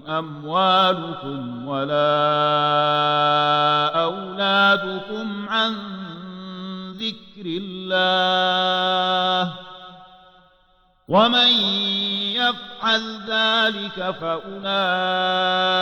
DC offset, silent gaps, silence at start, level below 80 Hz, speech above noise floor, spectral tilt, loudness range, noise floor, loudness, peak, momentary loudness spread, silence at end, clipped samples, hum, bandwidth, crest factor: under 0.1%; none; 0.05 s; -62 dBFS; 39 dB; -5 dB/octave; 4 LU; -59 dBFS; -20 LUFS; -6 dBFS; 14 LU; 0 s; under 0.1%; none; 16.5 kHz; 14 dB